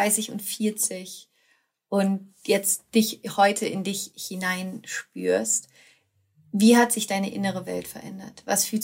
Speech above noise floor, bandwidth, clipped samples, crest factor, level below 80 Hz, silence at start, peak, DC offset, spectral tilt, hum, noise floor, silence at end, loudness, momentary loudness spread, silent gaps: 42 dB; 16 kHz; under 0.1%; 20 dB; -72 dBFS; 0 s; -6 dBFS; under 0.1%; -3.5 dB/octave; none; -67 dBFS; 0 s; -24 LUFS; 13 LU; none